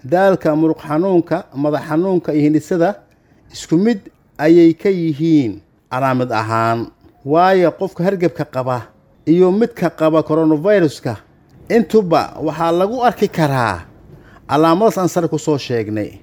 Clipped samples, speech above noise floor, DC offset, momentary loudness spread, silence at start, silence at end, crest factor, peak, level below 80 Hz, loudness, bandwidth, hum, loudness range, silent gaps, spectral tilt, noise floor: under 0.1%; 27 dB; under 0.1%; 10 LU; 0.05 s; 0.05 s; 16 dB; 0 dBFS; -52 dBFS; -16 LUFS; 16.5 kHz; none; 2 LU; none; -7 dB/octave; -42 dBFS